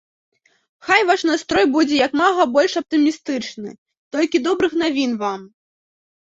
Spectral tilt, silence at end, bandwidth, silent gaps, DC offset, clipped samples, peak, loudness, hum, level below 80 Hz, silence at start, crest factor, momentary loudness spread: -3.5 dB/octave; 0.75 s; 7.8 kHz; 3.78-3.86 s, 3.97-4.11 s; under 0.1%; under 0.1%; -2 dBFS; -18 LUFS; none; -58 dBFS; 0.85 s; 18 dB; 13 LU